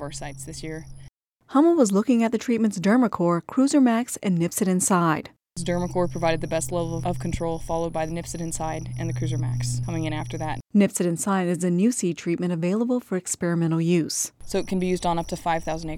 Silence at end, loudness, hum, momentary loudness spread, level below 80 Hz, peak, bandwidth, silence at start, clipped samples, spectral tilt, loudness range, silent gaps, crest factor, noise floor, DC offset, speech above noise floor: 0 s; -24 LUFS; none; 10 LU; -44 dBFS; -6 dBFS; 16.5 kHz; 0 s; under 0.1%; -5.5 dB/octave; 7 LU; none; 18 dB; -49 dBFS; under 0.1%; 26 dB